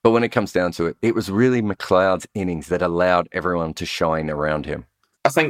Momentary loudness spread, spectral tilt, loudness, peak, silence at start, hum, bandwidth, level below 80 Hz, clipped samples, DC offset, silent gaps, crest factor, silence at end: 8 LU; -6 dB/octave; -21 LUFS; -2 dBFS; 0.05 s; none; 16.5 kHz; -46 dBFS; under 0.1%; under 0.1%; none; 18 dB; 0 s